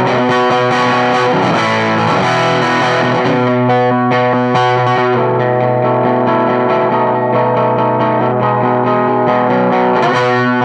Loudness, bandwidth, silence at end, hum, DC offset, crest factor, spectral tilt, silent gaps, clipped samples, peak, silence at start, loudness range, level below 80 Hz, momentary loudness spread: -12 LUFS; 9.8 kHz; 0 s; none; under 0.1%; 12 dB; -6.5 dB/octave; none; under 0.1%; 0 dBFS; 0 s; 1 LU; -56 dBFS; 1 LU